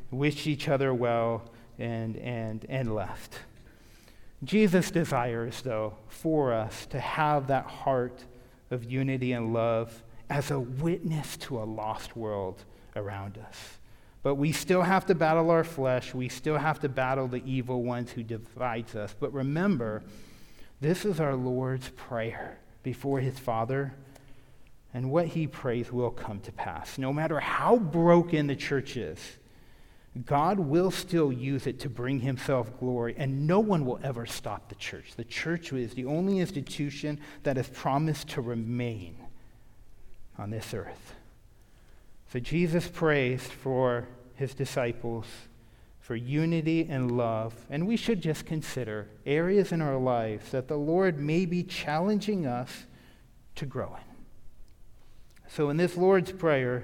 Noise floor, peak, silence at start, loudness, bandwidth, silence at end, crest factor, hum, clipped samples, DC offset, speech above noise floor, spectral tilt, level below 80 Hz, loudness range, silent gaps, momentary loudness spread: -55 dBFS; -10 dBFS; 0 s; -30 LUFS; 17.5 kHz; 0 s; 20 dB; none; under 0.1%; under 0.1%; 26 dB; -6.5 dB/octave; -54 dBFS; 7 LU; none; 14 LU